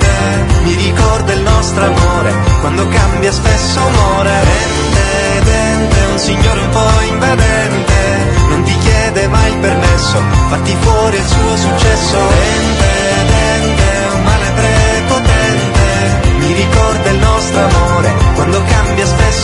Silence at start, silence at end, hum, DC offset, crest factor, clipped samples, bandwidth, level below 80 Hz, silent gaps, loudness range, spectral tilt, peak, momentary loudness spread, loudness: 0 s; 0 s; none; under 0.1%; 10 dB; 0.2%; 11 kHz; -16 dBFS; none; 0 LU; -5 dB/octave; 0 dBFS; 2 LU; -11 LUFS